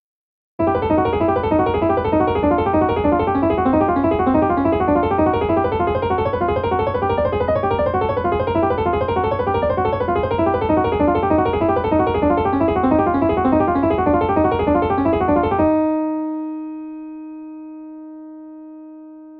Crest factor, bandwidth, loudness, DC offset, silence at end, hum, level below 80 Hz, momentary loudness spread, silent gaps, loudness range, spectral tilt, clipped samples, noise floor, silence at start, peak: 14 dB; 5.2 kHz; -18 LUFS; under 0.1%; 0 s; none; -36 dBFS; 16 LU; none; 3 LU; -10.5 dB/octave; under 0.1%; -38 dBFS; 0.6 s; -4 dBFS